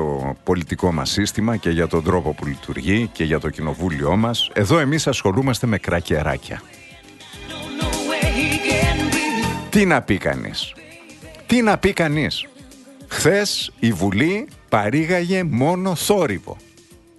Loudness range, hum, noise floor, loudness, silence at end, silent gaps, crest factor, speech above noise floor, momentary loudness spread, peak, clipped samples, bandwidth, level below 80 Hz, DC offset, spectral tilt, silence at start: 3 LU; none; -48 dBFS; -20 LUFS; 0.6 s; none; 16 dB; 29 dB; 12 LU; -4 dBFS; under 0.1%; 12.5 kHz; -36 dBFS; under 0.1%; -5 dB/octave; 0 s